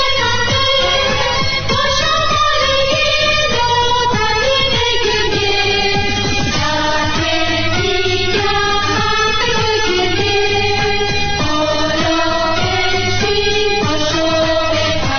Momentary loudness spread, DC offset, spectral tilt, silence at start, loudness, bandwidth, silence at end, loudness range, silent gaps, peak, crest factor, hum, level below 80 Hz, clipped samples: 3 LU; under 0.1%; -3.5 dB/octave; 0 s; -14 LUFS; 6.8 kHz; 0 s; 2 LU; none; -2 dBFS; 12 dB; none; -30 dBFS; under 0.1%